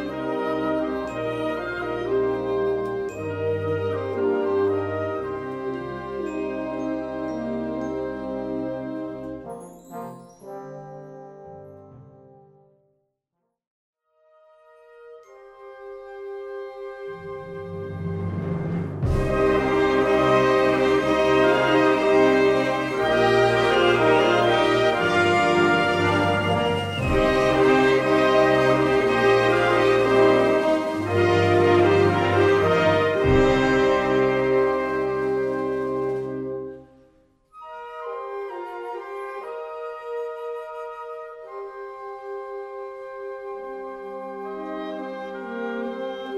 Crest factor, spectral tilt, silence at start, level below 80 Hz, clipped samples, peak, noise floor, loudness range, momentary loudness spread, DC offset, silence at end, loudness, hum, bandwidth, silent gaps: 16 dB; -6 dB/octave; 0 s; -44 dBFS; under 0.1%; -6 dBFS; -79 dBFS; 16 LU; 18 LU; under 0.1%; 0 s; -22 LUFS; none; 12 kHz; 13.67-13.93 s